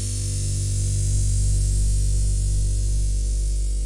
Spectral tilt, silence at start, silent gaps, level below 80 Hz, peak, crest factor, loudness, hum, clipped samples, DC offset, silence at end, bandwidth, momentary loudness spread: -4.5 dB/octave; 0 s; none; -22 dBFS; -12 dBFS; 8 dB; -24 LUFS; 50 Hz at -20 dBFS; under 0.1%; under 0.1%; 0 s; 11.5 kHz; 3 LU